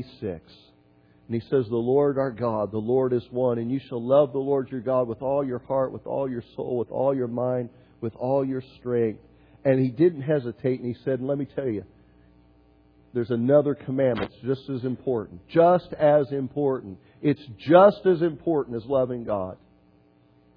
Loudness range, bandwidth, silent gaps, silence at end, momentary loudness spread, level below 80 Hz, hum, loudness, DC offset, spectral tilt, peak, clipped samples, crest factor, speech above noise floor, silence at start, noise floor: 6 LU; 5.2 kHz; none; 1 s; 11 LU; -60 dBFS; none; -25 LUFS; under 0.1%; -11 dB/octave; -4 dBFS; under 0.1%; 22 dB; 35 dB; 0 s; -59 dBFS